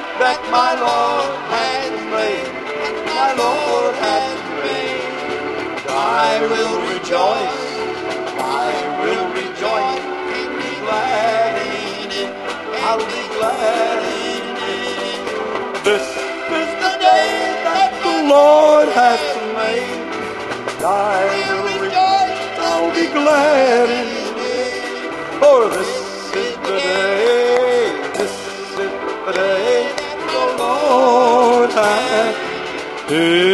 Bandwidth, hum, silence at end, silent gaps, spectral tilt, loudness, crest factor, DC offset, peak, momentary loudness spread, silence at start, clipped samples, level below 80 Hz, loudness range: 12.5 kHz; none; 0 s; none; -3 dB/octave; -17 LUFS; 16 dB; under 0.1%; 0 dBFS; 11 LU; 0 s; under 0.1%; -54 dBFS; 6 LU